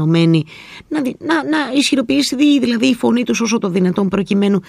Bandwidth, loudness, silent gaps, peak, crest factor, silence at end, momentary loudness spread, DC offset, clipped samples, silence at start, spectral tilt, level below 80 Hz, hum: 14.5 kHz; -15 LUFS; none; 0 dBFS; 14 dB; 0.05 s; 8 LU; under 0.1%; under 0.1%; 0 s; -5.5 dB/octave; -52 dBFS; none